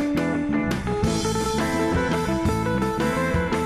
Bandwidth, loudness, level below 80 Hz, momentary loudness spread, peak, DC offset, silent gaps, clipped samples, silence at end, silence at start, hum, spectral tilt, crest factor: 15.5 kHz; -23 LUFS; -36 dBFS; 1 LU; -12 dBFS; under 0.1%; none; under 0.1%; 0 s; 0 s; none; -5.5 dB/octave; 10 dB